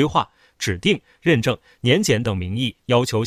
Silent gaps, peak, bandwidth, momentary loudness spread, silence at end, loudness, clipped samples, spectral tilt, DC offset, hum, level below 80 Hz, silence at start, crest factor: none; -4 dBFS; 16 kHz; 7 LU; 0 s; -21 LUFS; under 0.1%; -5 dB/octave; under 0.1%; none; -42 dBFS; 0 s; 16 dB